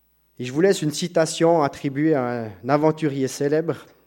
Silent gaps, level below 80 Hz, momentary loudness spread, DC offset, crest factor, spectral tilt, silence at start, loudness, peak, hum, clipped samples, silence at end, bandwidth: none; -64 dBFS; 9 LU; under 0.1%; 18 dB; -5.5 dB/octave; 0.4 s; -22 LUFS; -4 dBFS; none; under 0.1%; 0.25 s; 16.5 kHz